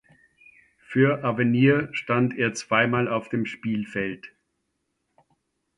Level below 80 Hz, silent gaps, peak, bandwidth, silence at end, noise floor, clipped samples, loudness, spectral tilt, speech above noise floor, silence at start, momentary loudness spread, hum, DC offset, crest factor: -62 dBFS; none; -6 dBFS; 11 kHz; 1.5 s; -77 dBFS; under 0.1%; -24 LUFS; -6.5 dB/octave; 53 dB; 0.9 s; 9 LU; none; under 0.1%; 18 dB